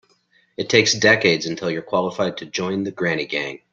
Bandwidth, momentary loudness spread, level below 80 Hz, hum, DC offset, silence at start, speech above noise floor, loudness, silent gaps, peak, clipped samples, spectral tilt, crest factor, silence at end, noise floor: 7.6 kHz; 11 LU; -62 dBFS; none; under 0.1%; 0.6 s; 40 dB; -19 LUFS; none; -2 dBFS; under 0.1%; -3.5 dB/octave; 20 dB; 0.15 s; -61 dBFS